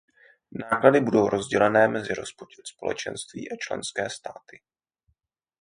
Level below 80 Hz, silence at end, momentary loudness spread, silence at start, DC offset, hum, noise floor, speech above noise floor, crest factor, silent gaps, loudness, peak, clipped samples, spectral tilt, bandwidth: -62 dBFS; 1.3 s; 20 LU; 0.55 s; under 0.1%; none; -73 dBFS; 49 dB; 24 dB; none; -24 LUFS; -2 dBFS; under 0.1%; -5 dB/octave; 10.5 kHz